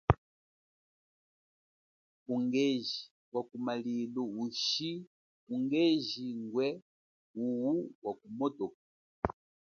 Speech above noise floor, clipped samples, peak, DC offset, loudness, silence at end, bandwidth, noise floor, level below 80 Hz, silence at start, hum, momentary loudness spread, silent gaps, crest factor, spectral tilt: over 56 dB; under 0.1%; -6 dBFS; under 0.1%; -35 LUFS; 0.3 s; 7 kHz; under -90 dBFS; -54 dBFS; 0.1 s; none; 11 LU; 0.18-2.26 s, 3.11-3.32 s, 5.07-5.47 s, 6.82-7.34 s, 7.95-8.02 s, 8.74-9.22 s; 30 dB; -5.5 dB/octave